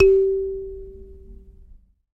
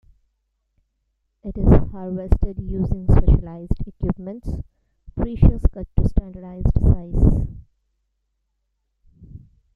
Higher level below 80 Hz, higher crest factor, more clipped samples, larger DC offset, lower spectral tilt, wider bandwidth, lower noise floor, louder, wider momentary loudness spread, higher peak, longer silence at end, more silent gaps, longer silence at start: second, -40 dBFS vs -24 dBFS; about the same, 20 dB vs 18 dB; neither; neither; second, -8.5 dB/octave vs -11.5 dB/octave; second, 2.8 kHz vs 3.3 kHz; second, -49 dBFS vs -73 dBFS; about the same, -21 LUFS vs -22 LUFS; first, 27 LU vs 16 LU; about the same, -4 dBFS vs -2 dBFS; first, 0.8 s vs 0.4 s; neither; second, 0 s vs 1.45 s